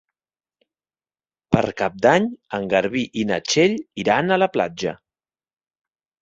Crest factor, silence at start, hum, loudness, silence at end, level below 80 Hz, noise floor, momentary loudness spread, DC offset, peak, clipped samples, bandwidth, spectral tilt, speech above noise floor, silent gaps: 20 dB; 1.5 s; none; -20 LUFS; 1.25 s; -54 dBFS; under -90 dBFS; 8 LU; under 0.1%; -2 dBFS; under 0.1%; 8 kHz; -5 dB/octave; over 70 dB; none